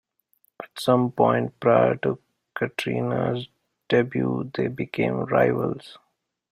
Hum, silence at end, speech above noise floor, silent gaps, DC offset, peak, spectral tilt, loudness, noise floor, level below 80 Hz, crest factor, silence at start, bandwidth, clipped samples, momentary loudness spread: none; 0.6 s; 45 dB; none; under 0.1%; -4 dBFS; -7 dB/octave; -24 LUFS; -67 dBFS; -60 dBFS; 20 dB; 0.6 s; 15.5 kHz; under 0.1%; 15 LU